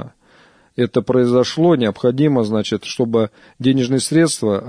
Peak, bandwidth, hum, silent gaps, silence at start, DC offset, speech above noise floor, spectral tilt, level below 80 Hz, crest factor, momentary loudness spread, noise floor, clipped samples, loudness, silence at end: -4 dBFS; 11 kHz; none; none; 0 s; under 0.1%; 35 dB; -5.5 dB/octave; -58 dBFS; 14 dB; 7 LU; -51 dBFS; under 0.1%; -17 LUFS; 0 s